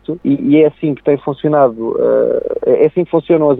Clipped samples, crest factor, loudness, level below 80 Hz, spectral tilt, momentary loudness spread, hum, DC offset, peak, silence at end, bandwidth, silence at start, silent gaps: under 0.1%; 12 dB; -13 LUFS; -50 dBFS; -11 dB/octave; 5 LU; none; under 0.1%; 0 dBFS; 0 s; 4 kHz; 0.1 s; none